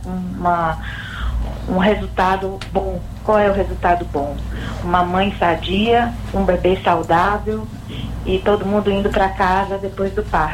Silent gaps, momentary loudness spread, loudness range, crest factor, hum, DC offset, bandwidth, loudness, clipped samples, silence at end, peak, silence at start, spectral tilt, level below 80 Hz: none; 10 LU; 2 LU; 16 dB; none; under 0.1%; 16 kHz; -19 LUFS; under 0.1%; 0 s; -2 dBFS; 0 s; -6.5 dB/octave; -30 dBFS